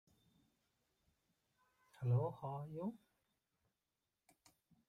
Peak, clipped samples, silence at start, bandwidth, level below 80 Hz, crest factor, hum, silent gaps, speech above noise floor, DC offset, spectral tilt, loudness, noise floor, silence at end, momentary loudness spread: -28 dBFS; under 0.1%; 2 s; 7 kHz; -80 dBFS; 20 dB; none; none; over 49 dB; under 0.1%; -10 dB/octave; -43 LUFS; under -90 dBFS; 1.9 s; 9 LU